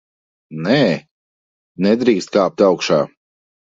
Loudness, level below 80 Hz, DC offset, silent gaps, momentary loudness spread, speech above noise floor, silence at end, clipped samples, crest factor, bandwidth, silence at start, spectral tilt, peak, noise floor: -17 LUFS; -60 dBFS; under 0.1%; 1.11-1.75 s; 11 LU; over 75 dB; 0.55 s; under 0.1%; 18 dB; 7.8 kHz; 0.5 s; -6 dB/octave; 0 dBFS; under -90 dBFS